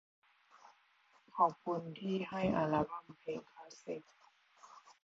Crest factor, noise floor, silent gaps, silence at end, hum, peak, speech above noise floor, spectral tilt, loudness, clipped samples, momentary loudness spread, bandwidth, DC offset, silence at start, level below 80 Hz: 22 dB; -71 dBFS; none; 0.1 s; none; -18 dBFS; 33 dB; -5.5 dB/octave; -38 LUFS; under 0.1%; 21 LU; 7.6 kHz; under 0.1%; 0.65 s; -68 dBFS